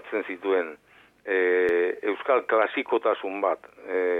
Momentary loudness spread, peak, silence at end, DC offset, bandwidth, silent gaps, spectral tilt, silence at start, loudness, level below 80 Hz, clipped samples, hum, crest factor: 9 LU; -10 dBFS; 0 s; under 0.1%; 4 kHz; none; -5.5 dB/octave; 0.05 s; -25 LUFS; -70 dBFS; under 0.1%; none; 16 dB